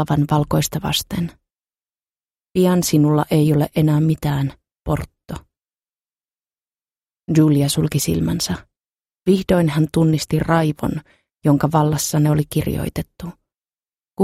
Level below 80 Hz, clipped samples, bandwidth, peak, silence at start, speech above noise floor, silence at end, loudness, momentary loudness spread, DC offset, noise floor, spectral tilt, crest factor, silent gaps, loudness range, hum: -42 dBFS; under 0.1%; 16 kHz; -2 dBFS; 0 s; over 73 dB; 0 s; -18 LUFS; 15 LU; under 0.1%; under -90 dBFS; -6 dB/octave; 16 dB; 8.88-8.92 s; 5 LU; none